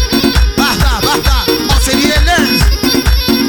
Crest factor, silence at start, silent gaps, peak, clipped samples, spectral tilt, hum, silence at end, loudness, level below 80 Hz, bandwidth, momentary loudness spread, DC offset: 10 dB; 0 s; none; 0 dBFS; under 0.1%; -4 dB/octave; none; 0 s; -11 LUFS; -14 dBFS; 19 kHz; 2 LU; under 0.1%